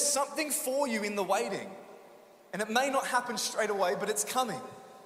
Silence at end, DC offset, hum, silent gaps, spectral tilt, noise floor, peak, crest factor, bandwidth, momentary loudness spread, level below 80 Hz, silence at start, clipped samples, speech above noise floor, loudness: 0 s; under 0.1%; none; none; -2 dB/octave; -55 dBFS; -14 dBFS; 18 dB; 16 kHz; 13 LU; -78 dBFS; 0 s; under 0.1%; 24 dB; -31 LUFS